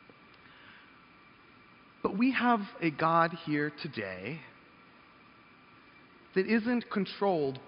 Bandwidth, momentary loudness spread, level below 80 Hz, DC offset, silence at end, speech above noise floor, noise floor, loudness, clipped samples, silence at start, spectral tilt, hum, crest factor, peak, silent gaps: 5.4 kHz; 14 LU; -72 dBFS; under 0.1%; 0 s; 28 dB; -58 dBFS; -31 LUFS; under 0.1%; 0.65 s; -4.5 dB/octave; none; 22 dB; -12 dBFS; none